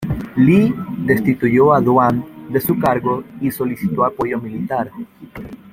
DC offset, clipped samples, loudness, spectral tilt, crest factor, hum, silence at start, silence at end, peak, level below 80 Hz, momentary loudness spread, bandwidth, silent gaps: under 0.1%; under 0.1%; -17 LUFS; -8 dB/octave; 16 dB; none; 0 s; 0.05 s; 0 dBFS; -44 dBFS; 14 LU; 16.5 kHz; none